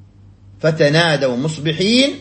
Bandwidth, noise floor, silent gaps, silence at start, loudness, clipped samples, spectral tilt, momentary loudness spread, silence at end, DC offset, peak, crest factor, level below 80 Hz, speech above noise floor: 8.8 kHz; -44 dBFS; none; 0.6 s; -16 LUFS; under 0.1%; -5 dB/octave; 7 LU; 0 s; under 0.1%; -2 dBFS; 16 dB; -52 dBFS; 28 dB